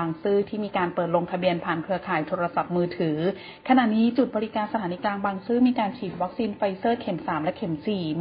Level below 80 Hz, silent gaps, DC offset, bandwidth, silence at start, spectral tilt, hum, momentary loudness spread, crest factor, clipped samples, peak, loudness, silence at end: -60 dBFS; none; under 0.1%; 5.2 kHz; 0 s; -11 dB/octave; none; 7 LU; 18 dB; under 0.1%; -8 dBFS; -25 LUFS; 0 s